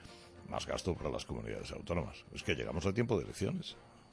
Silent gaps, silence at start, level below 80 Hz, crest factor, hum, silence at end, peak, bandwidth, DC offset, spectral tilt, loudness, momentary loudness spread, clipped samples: none; 0 s; -54 dBFS; 22 dB; none; 0.05 s; -16 dBFS; 11 kHz; under 0.1%; -5.5 dB/octave; -38 LUFS; 11 LU; under 0.1%